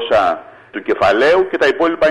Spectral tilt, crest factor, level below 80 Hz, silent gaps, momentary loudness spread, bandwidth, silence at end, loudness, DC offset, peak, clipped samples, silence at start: -4.5 dB/octave; 10 dB; -46 dBFS; none; 14 LU; 11.5 kHz; 0 s; -14 LUFS; under 0.1%; -4 dBFS; under 0.1%; 0 s